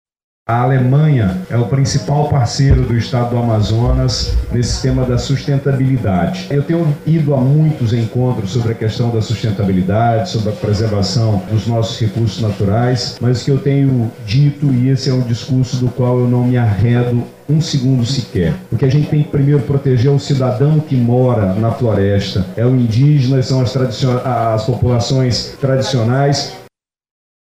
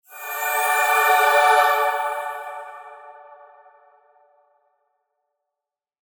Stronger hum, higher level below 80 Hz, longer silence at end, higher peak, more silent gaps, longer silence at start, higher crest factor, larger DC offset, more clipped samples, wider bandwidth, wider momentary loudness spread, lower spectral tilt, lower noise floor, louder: neither; first, -30 dBFS vs under -90 dBFS; second, 0.95 s vs 3 s; about the same, -2 dBFS vs -4 dBFS; neither; first, 0.5 s vs 0.1 s; second, 10 dB vs 20 dB; neither; neither; second, 10 kHz vs over 20 kHz; second, 5 LU vs 20 LU; first, -7 dB/octave vs 3 dB/octave; second, -46 dBFS vs -87 dBFS; first, -14 LUFS vs -18 LUFS